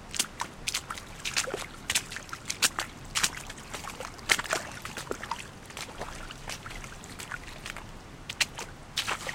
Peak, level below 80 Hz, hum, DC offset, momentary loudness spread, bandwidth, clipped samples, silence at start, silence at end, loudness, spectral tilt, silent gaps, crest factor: -4 dBFS; -50 dBFS; none; under 0.1%; 14 LU; 17 kHz; under 0.1%; 0 s; 0 s; -33 LUFS; -1 dB/octave; none; 32 dB